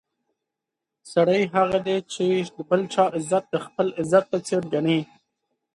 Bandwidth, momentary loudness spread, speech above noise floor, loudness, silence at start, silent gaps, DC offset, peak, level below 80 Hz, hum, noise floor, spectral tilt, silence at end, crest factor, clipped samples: 11.5 kHz; 6 LU; 63 dB; -23 LUFS; 1.05 s; none; under 0.1%; -4 dBFS; -64 dBFS; none; -85 dBFS; -5.5 dB/octave; 0.7 s; 20 dB; under 0.1%